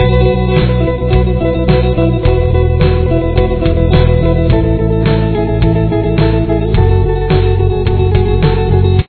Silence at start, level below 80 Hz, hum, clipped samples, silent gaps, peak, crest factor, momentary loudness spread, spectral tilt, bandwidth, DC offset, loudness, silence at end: 0 s; -16 dBFS; none; 0.2%; none; 0 dBFS; 10 dB; 2 LU; -11.5 dB/octave; 4.5 kHz; under 0.1%; -12 LUFS; 0.05 s